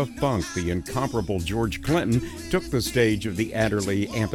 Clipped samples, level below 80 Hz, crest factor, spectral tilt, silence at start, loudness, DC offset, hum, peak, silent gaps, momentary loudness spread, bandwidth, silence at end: under 0.1%; -40 dBFS; 18 dB; -5.5 dB/octave; 0 s; -25 LUFS; under 0.1%; none; -6 dBFS; none; 5 LU; 19 kHz; 0 s